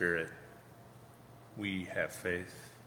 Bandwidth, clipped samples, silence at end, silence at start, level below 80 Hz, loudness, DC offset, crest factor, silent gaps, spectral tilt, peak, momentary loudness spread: over 20 kHz; under 0.1%; 0 s; 0 s; -68 dBFS; -38 LUFS; under 0.1%; 24 dB; none; -5 dB/octave; -16 dBFS; 20 LU